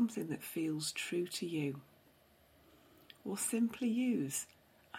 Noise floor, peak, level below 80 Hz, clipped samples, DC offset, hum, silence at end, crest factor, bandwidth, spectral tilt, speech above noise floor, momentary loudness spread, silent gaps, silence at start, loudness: -67 dBFS; -24 dBFS; -78 dBFS; under 0.1%; under 0.1%; none; 0 s; 16 dB; 16.5 kHz; -4 dB/octave; 30 dB; 9 LU; none; 0 s; -37 LUFS